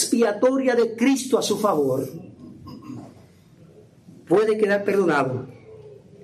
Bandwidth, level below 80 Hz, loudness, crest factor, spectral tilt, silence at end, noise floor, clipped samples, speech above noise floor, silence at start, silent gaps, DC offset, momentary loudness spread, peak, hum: 15 kHz; -66 dBFS; -21 LUFS; 16 dB; -4.5 dB/octave; 0.3 s; -50 dBFS; under 0.1%; 30 dB; 0 s; none; under 0.1%; 21 LU; -6 dBFS; none